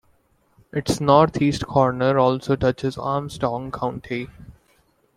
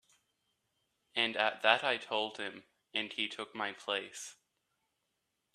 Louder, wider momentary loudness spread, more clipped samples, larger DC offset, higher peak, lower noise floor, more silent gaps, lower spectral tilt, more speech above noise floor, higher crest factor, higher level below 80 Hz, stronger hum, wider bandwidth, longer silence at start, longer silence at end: first, -21 LUFS vs -34 LUFS; about the same, 14 LU vs 15 LU; neither; neither; first, -2 dBFS vs -10 dBFS; second, -62 dBFS vs -84 dBFS; neither; first, -6.5 dB/octave vs -1.5 dB/octave; second, 41 dB vs 48 dB; second, 20 dB vs 28 dB; first, -48 dBFS vs -86 dBFS; neither; about the same, 15 kHz vs 14 kHz; second, 0.75 s vs 1.15 s; second, 0.65 s vs 1.2 s